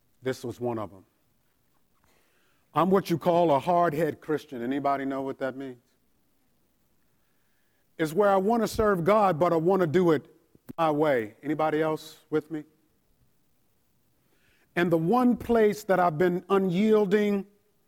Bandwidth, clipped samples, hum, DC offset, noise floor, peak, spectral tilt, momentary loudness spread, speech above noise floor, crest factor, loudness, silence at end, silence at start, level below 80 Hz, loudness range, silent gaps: 17 kHz; under 0.1%; none; under 0.1%; -71 dBFS; -10 dBFS; -7 dB/octave; 11 LU; 46 dB; 16 dB; -26 LUFS; 0.45 s; 0.25 s; -58 dBFS; 9 LU; none